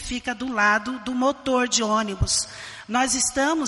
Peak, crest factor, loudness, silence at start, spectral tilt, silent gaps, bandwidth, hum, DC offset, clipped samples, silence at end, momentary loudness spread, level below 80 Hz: -8 dBFS; 16 dB; -22 LUFS; 0 s; -2.5 dB/octave; none; 11.5 kHz; none; under 0.1%; under 0.1%; 0 s; 8 LU; -40 dBFS